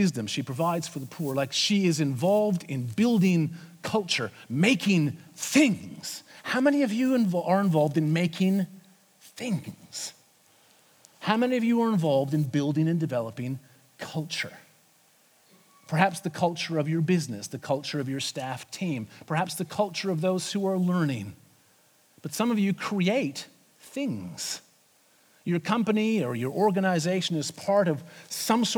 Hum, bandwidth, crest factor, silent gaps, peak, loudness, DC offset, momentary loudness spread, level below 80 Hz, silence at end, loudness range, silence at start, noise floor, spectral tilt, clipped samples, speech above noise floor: none; over 20 kHz; 22 dB; none; -6 dBFS; -27 LUFS; under 0.1%; 13 LU; -74 dBFS; 0 s; 6 LU; 0 s; -62 dBFS; -5.5 dB/octave; under 0.1%; 36 dB